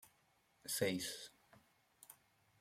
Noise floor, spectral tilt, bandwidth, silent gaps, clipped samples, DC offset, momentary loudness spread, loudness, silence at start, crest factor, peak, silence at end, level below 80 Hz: -76 dBFS; -3 dB/octave; 16 kHz; none; under 0.1%; under 0.1%; 24 LU; -42 LUFS; 0.05 s; 26 dB; -22 dBFS; 0.45 s; -80 dBFS